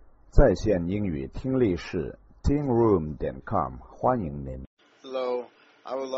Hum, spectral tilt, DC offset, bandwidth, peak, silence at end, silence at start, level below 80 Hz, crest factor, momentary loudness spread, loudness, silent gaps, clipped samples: none; -7.5 dB/octave; under 0.1%; 7.6 kHz; -4 dBFS; 0 s; 0.35 s; -34 dBFS; 22 dB; 15 LU; -27 LUFS; 4.67-4.77 s; under 0.1%